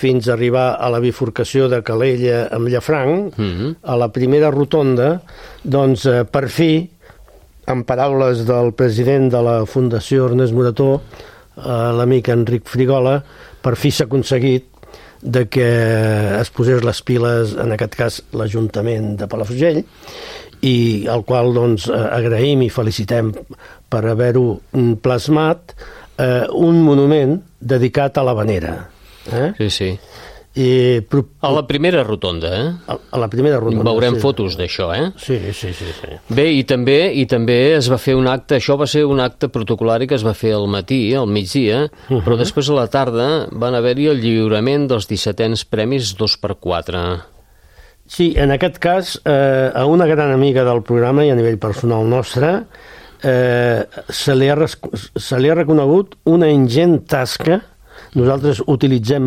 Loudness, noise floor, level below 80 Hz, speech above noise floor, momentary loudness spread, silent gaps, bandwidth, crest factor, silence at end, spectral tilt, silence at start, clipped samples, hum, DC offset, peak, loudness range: -16 LUFS; -45 dBFS; -40 dBFS; 30 dB; 8 LU; none; 15.5 kHz; 12 dB; 0 s; -6.5 dB/octave; 0 s; under 0.1%; none; under 0.1%; -2 dBFS; 4 LU